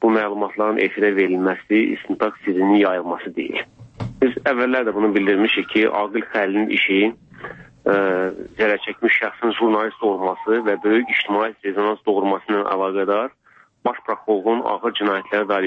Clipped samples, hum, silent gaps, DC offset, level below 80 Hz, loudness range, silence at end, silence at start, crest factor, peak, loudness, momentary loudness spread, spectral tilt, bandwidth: under 0.1%; none; none; under 0.1%; -60 dBFS; 3 LU; 0 s; 0 s; 14 dB; -4 dBFS; -20 LUFS; 9 LU; -7 dB/octave; 5.8 kHz